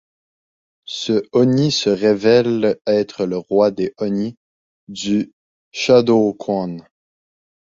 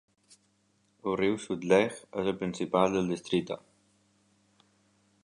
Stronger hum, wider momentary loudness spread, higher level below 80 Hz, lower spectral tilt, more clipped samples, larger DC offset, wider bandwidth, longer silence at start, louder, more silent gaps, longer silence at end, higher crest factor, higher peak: neither; first, 14 LU vs 9 LU; first, -58 dBFS vs -64 dBFS; about the same, -5.5 dB/octave vs -5.5 dB/octave; neither; neither; second, 7.8 kHz vs 11 kHz; second, 0.9 s vs 1.05 s; first, -17 LUFS vs -30 LUFS; first, 2.81-2.85 s, 4.37-4.87 s, 5.33-5.72 s vs none; second, 0.85 s vs 1.7 s; second, 16 dB vs 22 dB; first, -2 dBFS vs -10 dBFS